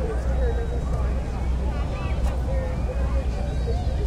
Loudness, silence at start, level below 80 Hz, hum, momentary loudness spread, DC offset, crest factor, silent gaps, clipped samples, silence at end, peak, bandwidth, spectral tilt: -27 LUFS; 0 s; -24 dBFS; none; 2 LU; under 0.1%; 12 dB; none; under 0.1%; 0 s; -12 dBFS; 9.6 kHz; -7.5 dB/octave